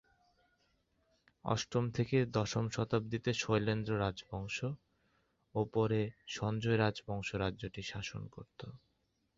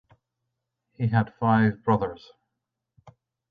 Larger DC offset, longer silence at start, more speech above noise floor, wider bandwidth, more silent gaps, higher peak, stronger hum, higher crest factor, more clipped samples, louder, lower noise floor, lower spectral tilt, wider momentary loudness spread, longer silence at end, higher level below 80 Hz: neither; first, 1.45 s vs 1 s; second, 44 dB vs 60 dB; first, 7.6 kHz vs 5.2 kHz; neither; second, -16 dBFS vs -8 dBFS; neither; about the same, 20 dB vs 20 dB; neither; second, -36 LUFS vs -24 LUFS; second, -79 dBFS vs -83 dBFS; second, -5.5 dB/octave vs -10 dB/octave; about the same, 13 LU vs 11 LU; first, 0.6 s vs 0.4 s; about the same, -60 dBFS vs -58 dBFS